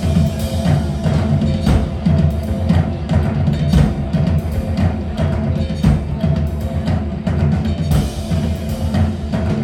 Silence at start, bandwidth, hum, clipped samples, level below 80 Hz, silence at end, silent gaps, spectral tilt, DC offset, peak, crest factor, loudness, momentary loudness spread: 0 s; 15.5 kHz; none; under 0.1%; -24 dBFS; 0 s; none; -8 dB/octave; under 0.1%; 0 dBFS; 16 dB; -17 LUFS; 5 LU